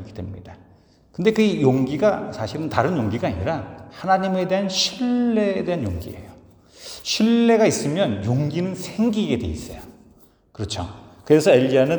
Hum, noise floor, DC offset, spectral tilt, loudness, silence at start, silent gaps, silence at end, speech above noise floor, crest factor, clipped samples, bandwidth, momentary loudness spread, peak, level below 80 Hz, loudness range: none; -53 dBFS; under 0.1%; -5.5 dB/octave; -21 LUFS; 0 s; none; 0 s; 33 dB; 20 dB; under 0.1%; over 20 kHz; 19 LU; -2 dBFS; -48 dBFS; 3 LU